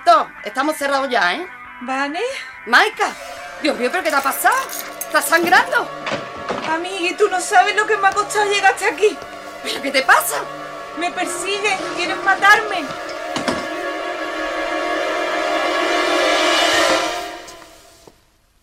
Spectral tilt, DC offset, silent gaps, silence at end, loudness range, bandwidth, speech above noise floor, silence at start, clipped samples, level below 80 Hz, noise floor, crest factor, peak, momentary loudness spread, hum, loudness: -1.5 dB/octave; under 0.1%; none; 0.95 s; 2 LU; 16 kHz; 38 dB; 0 s; under 0.1%; -56 dBFS; -56 dBFS; 18 dB; -2 dBFS; 13 LU; none; -18 LUFS